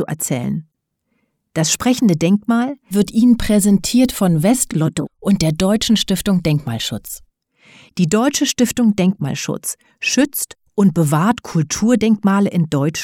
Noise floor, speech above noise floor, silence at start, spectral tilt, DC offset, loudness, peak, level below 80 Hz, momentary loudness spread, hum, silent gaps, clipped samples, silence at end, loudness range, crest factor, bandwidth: -70 dBFS; 54 dB; 0 s; -5 dB/octave; under 0.1%; -16 LUFS; -2 dBFS; -42 dBFS; 9 LU; none; none; under 0.1%; 0 s; 3 LU; 16 dB; 18 kHz